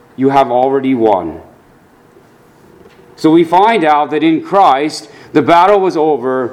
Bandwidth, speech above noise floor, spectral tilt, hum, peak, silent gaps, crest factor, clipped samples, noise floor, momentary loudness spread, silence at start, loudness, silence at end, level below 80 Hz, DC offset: 12 kHz; 35 dB; -6 dB/octave; none; 0 dBFS; none; 12 dB; 0.2%; -45 dBFS; 7 LU; 0.2 s; -11 LUFS; 0 s; -52 dBFS; under 0.1%